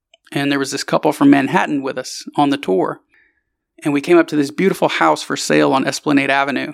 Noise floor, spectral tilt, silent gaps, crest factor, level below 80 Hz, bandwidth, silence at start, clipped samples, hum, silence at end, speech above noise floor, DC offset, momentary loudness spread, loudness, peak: -68 dBFS; -4.5 dB/octave; none; 16 dB; -70 dBFS; 14.5 kHz; 0.3 s; under 0.1%; none; 0 s; 52 dB; under 0.1%; 10 LU; -16 LUFS; 0 dBFS